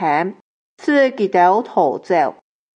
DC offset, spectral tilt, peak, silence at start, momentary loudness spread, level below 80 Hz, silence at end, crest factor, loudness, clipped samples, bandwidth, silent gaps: under 0.1%; -6.5 dB/octave; -2 dBFS; 0 s; 8 LU; -76 dBFS; 0.45 s; 14 dB; -17 LUFS; under 0.1%; 8.8 kHz; 0.41-0.77 s